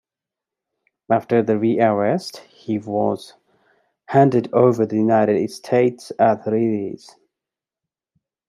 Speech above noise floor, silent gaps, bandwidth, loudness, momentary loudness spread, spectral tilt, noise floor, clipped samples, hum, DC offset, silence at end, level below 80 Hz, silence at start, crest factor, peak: 69 dB; none; 13 kHz; -19 LUFS; 11 LU; -7.5 dB/octave; -87 dBFS; under 0.1%; none; under 0.1%; 1.55 s; -68 dBFS; 1.1 s; 18 dB; -2 dBFS